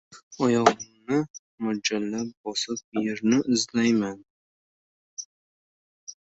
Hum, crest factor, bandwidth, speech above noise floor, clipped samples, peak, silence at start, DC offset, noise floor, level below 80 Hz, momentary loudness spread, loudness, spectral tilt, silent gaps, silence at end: none; 26 dB; 8.2 kHz; over 65 dB; under 0.1%; -2 dBFS; 0.1 s; under 0.1%; under -90 dBFS; -68 dBFS; 18 LU; -26 LUFS; -4 dB/octave; 0.23-0.31 s, 1.30-1.58 s, 2.37-2.44 s, 2.84-2.92 s, 4.30-5.17 s, 5.25-6.07 s; 0.1 s